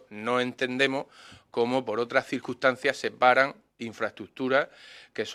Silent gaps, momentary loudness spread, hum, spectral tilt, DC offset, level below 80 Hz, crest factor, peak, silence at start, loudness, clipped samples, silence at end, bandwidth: none; 13 LU; none; -4.5 dB/octave; under 0.1%; -74 dBFS; 22 dB; -6 dBFS; 0.1 s; -27 LUFS; under 0.1%; 0 s; 13 kHz